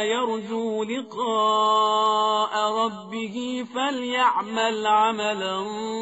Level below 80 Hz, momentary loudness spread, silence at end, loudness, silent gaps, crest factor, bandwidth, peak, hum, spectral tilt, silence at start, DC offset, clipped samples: -72 dBFS; 10 LU; 0 s; -23 LUFS; none; 16 dB; 8 kHz; -8 dBFS; none; -1 dB/octave; 0 s; under 0.1%; under 0.1%